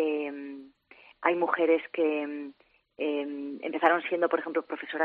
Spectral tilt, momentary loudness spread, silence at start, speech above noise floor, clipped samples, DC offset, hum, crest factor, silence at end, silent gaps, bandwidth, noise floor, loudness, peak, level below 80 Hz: -1.5 dB/octave; 15 LU; 0 s; 29 dB; under 0.1%; under 0.1%; none; 24 dB; 0 s; none; 4.7 kHz; -57 dBFS; -29 LUFS; -6 dBFS; -80 dBFS